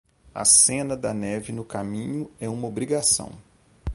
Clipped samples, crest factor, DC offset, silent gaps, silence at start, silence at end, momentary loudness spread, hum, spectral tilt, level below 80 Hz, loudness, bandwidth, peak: under 0.1%; 22 dB; under 0.1%; none; 0.35 s; 0 s; 17 LU; none; -2.5 dB/octave; -46 dBFS; -22 LUFS; 12 kHz; -4 dBFS